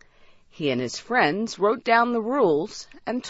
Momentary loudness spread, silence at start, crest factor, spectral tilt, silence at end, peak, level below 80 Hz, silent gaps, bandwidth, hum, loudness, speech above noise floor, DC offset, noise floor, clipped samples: 10 LU; 0.6 s; 18 dB; -4.5 dB/octave; 0 s; -6 dBFS; -62 dBFS; none; 8 kHz; none; -23 LUFS; 30 dB; under 0.1%; -53 dBFS; under 0.1%